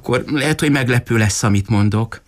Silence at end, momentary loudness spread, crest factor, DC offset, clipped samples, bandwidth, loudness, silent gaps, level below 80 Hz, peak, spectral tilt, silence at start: 0.1 s; 3 LU; 12 dB; under 0.1%; under 0.1%; 15.5 kHz; -16 LUFS; none; -42 dBFS; -4 dBFS; -5.5 dB/octave; 0.05 s